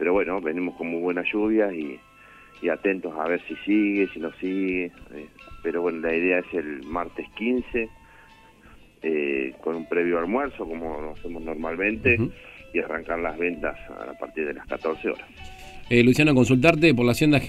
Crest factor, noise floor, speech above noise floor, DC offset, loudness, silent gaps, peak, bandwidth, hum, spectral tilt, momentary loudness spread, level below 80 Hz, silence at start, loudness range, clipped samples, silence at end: 24 dB; -51 dBFS; 27 dB; under 0.1%; -24 LUFS; none; 0 dBFS; 14.5 kHz; 50 Hz at -60 dBFS; -6.5 dB/octave; 17 LU; -48 dBFS; 0 s; 6 LU; under 0.1%; 0 s